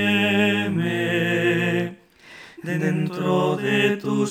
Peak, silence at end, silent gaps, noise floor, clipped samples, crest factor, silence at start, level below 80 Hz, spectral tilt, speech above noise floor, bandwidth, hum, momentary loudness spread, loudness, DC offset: -6 dBFS; 0 s; none; -46 dBFS; under 0.1%; 16 dB; 0 s; -72 dBFS; -6 dB/octave; 24 dB; 17 kHz; none; 8 LU; -21 LUFS; under 0.1%